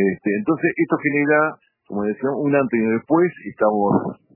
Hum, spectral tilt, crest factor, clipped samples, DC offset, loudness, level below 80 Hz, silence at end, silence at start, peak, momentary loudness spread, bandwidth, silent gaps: none; -13 dB/octave; 18 dB; under 0.1%; under 0.1%; -20 LUFS; -62 dBFS; 0.2 s; 0 s; -2 dBFS; 6 LU; 3 kHz; none